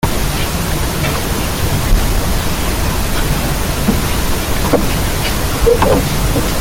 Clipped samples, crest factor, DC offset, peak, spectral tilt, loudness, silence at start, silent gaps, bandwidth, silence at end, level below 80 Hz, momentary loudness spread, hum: under 0.1%; 14 dB; under 0.1%; 0 dBFS; -4.5 dB/octave; -16 LUFS; 0 s; none; 17 kHz; 0 s; -18 dBFS; 4 LU; none